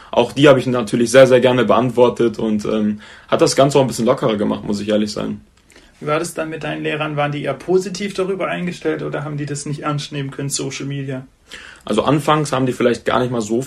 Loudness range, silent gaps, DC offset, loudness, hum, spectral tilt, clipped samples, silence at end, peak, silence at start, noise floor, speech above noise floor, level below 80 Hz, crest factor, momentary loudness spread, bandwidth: 8 LU; none; under 0.1%; -17 LUFS; none; -5.5 dB/octave; under 0.1%; 0 s; 0 dBFS; 0 s; -48 dBFS; 31 dB; -50 dBFS; 18 dB; 13 LU; 13.5 kHz